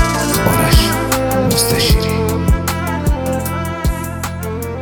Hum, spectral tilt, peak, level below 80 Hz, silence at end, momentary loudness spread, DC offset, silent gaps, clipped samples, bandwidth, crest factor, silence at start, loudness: none; -4.5 dB/octave; 0 dBFS; -22 dBFS; 0 s; 10 LU; under 0.1%; none; under 0.1%; 19.5 kHz; 14 dB; 0 s; -15 LUFS